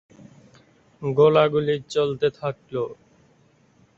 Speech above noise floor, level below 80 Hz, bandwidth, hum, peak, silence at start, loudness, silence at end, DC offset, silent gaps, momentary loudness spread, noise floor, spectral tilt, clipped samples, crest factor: 38 dB; -62 dBFS; 7.8 kHz; none; -4 dBFS; 1 s; -22 LUFS; 1.05 s; under 0.1%; none; 15 LU; -59 dBFS; -6.5 dB/octave; under 0.1%; 20 dB